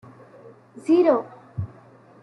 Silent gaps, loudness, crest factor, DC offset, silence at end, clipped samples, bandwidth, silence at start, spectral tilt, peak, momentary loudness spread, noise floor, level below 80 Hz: none; -22 LUFS; 18 dB; under 0.1%; 0.55 s; under 0.1%; 10 kHz; 0.85 s; -8.5 dB/octave; -8 dBFS; 18 LU; -50 dBFS; -60 dBFS